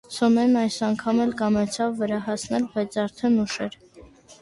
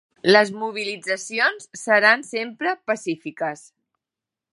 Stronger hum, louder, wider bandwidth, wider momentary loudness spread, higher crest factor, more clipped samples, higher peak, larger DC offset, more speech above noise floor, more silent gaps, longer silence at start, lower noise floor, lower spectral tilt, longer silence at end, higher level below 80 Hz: neither; second, -24 LUFS vs -21 LUFS; about the same, 11.5 kHz vs 11.5 kHz; second, 8 LU vs 13 LU; about the same, 16 dB vs 20 dB; neither; second, -8 dBFS vs -2 dBFS; neither; second, 26 dB vs 66 dB; neither; second, 0.1 s vs 0.25 s; second, -49 dBFS vs -88 dBFS; first, -5 dB/octave vs -3 dB/octave; second, 0.1 s vs 1 s; first, -58 dBFS vs -78 dBFS